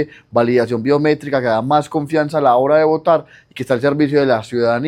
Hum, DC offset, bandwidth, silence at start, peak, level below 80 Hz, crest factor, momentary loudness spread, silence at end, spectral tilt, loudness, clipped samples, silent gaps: none; under 0.1%; 12.5 kHz; 0 s; 0 dBFS; -56 dBFS; 14 dB; 5 LU; 0 s; -7 dB/octave; -16 LUFS; under 0.1%; none